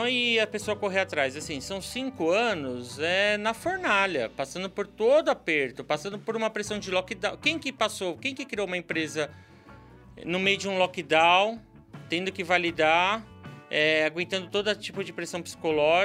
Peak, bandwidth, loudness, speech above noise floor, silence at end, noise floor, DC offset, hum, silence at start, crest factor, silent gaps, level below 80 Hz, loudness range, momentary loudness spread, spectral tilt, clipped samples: -6 dBFS; 16 kHz; -27 LUFS; 23 dB; 0 s; -50 dBFS; under 0.1%; none; 0 s; 20 dB; none; -60 dBFS; 5 LU; 11 LU; -3.5 dB/octave; under 0.1%